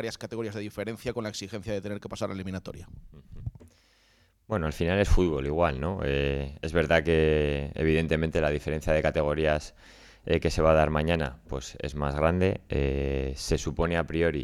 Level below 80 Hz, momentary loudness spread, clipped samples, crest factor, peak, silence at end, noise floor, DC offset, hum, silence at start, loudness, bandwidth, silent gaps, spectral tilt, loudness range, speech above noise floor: -38 dBFS; 13 LU; under 0.1%; 20 dB; -8 dBFS; 0 s; -64 dBFS; under 0.1%; none; 0 s; -28 LUFS; 14 kHz; none; -6 dB/octave; 10 LU; 37 dB